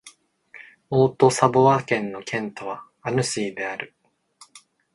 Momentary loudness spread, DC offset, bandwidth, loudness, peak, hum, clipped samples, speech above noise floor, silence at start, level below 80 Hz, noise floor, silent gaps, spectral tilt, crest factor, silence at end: 16 LU; under 0.1%; 11.5 kHz; -22 LUFS; -2 dBFS; none; under 0.1%; 33 dB; 0.05 s; -62 dBFS; -54 dBFS; none; -5 dB/octave; 22 dB; 0.35 s